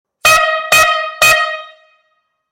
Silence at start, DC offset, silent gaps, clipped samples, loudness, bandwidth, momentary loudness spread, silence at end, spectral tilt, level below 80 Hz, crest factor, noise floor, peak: 0.25 s; under 0.1%; none; under 0.1%; -10 LUFS; 17 kHz; 7 LU; 0.85 s; 0.5 dB/octave; -44 dBFS; 14 dB; -64 dBFS; 0 dBFS